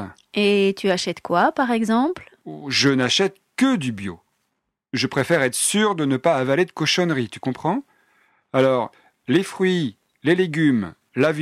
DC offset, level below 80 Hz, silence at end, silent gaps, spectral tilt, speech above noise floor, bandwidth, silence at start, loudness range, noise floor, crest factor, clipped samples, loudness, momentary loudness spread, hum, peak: under 0.1%; -62 dBFS; 0 s; none; -4.5 dB/octave; 56 dB; 14.5 kHz; 0 s; 2 LU; -76 dBFS; 16 dB; under 0.1%; -21 LUFS; 10 LU; none; -6 dBFS